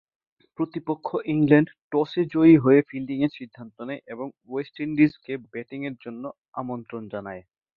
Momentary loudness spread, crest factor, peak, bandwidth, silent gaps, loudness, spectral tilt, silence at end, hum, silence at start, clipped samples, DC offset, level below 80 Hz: 19 LU; 22 dB; -4 dBFS; 4.8 kHz; 1.81-1.90 s, 6.48-6.52 s; -23 LUFS; -10.5 dB/octave; 0.35 s; none; 0.6 s; under 0.1%; under 0.1%; -64 dBFS